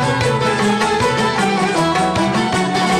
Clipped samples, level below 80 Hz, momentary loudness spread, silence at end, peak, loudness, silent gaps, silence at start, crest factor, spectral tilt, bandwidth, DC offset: under 0.1%; -42 dBFS; 1 LU; 0 s; -8 dBFS; -16 LUFS; none; 0 s; 8 dB; -4.5 dB/octave; 15 kHz; under 0.1%